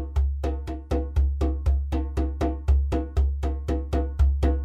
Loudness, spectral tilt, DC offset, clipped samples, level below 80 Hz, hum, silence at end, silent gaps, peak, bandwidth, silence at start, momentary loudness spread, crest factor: -26 LUFS; -8.5 dB/octave; under 0.1%; under 0.1%; -24 dBFS; none; 0 s; none; -10 dBFS; 6.6 kHz; 0 s; 5 LU; 14 dB